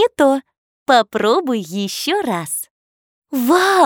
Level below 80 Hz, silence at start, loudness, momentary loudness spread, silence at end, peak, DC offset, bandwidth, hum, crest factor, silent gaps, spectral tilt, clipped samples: -62 dBFS; 0 s; -17 LUFS; 11 LU; 0 s; -2 dBFS; under 0.1%; over 20 kHz; none; 16 dB; 0.58-0.86 s, 2.70-3.22 s; -3.5 dB/octave; under 0.1%